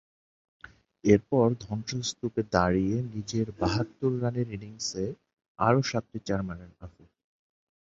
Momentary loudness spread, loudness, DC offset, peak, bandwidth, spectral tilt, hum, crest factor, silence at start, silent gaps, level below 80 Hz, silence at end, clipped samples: 11 LU; -29 LUFS; under 0.1%; -6 dBFS; 8 kHz; -6 dB/octave; none; 24 dB; 0.65 s; 5.48-5.55 s; -52 dBFS; 1 s; under 0.1%